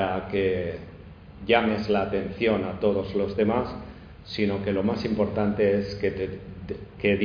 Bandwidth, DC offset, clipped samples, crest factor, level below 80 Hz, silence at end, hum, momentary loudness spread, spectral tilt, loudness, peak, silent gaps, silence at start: 5.2 kHz; under 0.1%; under 0.1%; 20 dB; -48 dBFS; 0 s; none; 16 LU; -8 dB/octave; -26 LUFS; -6 dBFS; none; 0 s